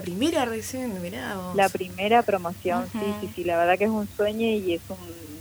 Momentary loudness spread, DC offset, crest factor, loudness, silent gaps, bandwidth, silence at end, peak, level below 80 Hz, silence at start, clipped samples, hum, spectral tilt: 10 LU; under 0.1%; 18 dB; -25 LUFS; none; over 20 kHz; 0 s; -8 dBFS; -56 dBFS; 0 s; under 0.1%; none; -5 dB/octave